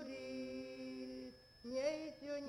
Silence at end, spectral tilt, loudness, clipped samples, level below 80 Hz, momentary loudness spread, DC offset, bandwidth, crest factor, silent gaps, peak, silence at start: 0 s; -4 dB/octave; -46 LUFS; under 0.1%; -74 dBFS; 12 LU; under 0.1%; 16 kHz; 18 dB; none; -28 dBFS; 0 s